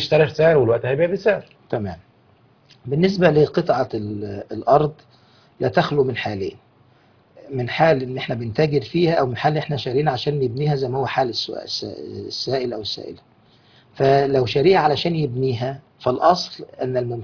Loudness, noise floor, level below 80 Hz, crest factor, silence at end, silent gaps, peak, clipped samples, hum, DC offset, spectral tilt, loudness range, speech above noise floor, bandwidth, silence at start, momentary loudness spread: -20 LUFS; -55 dBFS; -54 dBFS; 20 dB; 0 s; none; -2 dBFS; under 0.1%; none; under 0.1%; -6.5 dB/octave; 4 LU; 36 dB; 5.4 kHz; 0 s; 13 LU